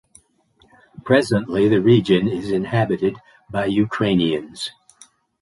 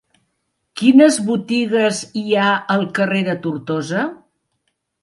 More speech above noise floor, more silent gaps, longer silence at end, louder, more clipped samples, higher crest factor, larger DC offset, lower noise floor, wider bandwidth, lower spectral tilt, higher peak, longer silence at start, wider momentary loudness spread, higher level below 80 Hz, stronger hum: second, 40 dB vs 55 dB; neither; second, 0.7 s vs 0.9 s; about the same, -19 LUFS vs -17 LUFS; neither; about the same, 18 dB vs 18 dB; neither; second, -59 dBFS vs -71 dBFS; about the same, 11.5 kHz vs 11.5 kHz; first, -6.5 dB/octave vs -5 dB/octave; about the same, -2 dBFS vs 0 dBFS; first, 1.05 s vs 0.75 s; about the same, 14 LU vs 12 LU; first, -52 dBFS vs -66 dBFS; neither